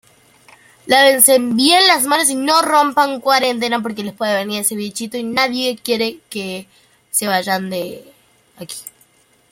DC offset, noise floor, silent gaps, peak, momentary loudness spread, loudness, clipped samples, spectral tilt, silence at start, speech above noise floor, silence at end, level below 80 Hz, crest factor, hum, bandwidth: under 0.1%; -54 dBFS; none; 0 dBFS; 16 LU; -15 LUFS; under 0.1%; -2 dB/octave; 0.85 s; 38 dB; 0.6 s; -64 dBFS; 18 dB; none; 16.5 kHz